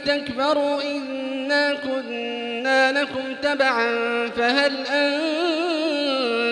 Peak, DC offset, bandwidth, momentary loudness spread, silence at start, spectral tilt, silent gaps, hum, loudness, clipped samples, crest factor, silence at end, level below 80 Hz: -6 dBFS; under 0.1%; 10.5 kHz; 8 LU; 0 s; -3 dB/octave; none; none; -22 LUFS; under 0.1%; 16 dB; 0 s; -64 dBFS